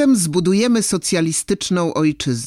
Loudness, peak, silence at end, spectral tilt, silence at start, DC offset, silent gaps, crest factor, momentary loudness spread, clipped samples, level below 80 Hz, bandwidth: -17 LUFS; -6 dBFS; 0 s; -4.5 dB/octave; 0 s; under 0.1%; none; 12 dB; 3 LU; under 0.1%; -50 dBFS; 16 kHz